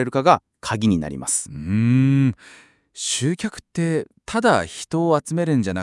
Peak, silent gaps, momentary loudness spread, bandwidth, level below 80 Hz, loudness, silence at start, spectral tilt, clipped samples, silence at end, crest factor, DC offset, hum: 0 dBFS; none; 9 LU; 12 kHz; -54 dBFS; -21 LUFS; 0 s; -5.5 dB/octave; under 0.1%; 0 s; 20 dB; under 0.1%; none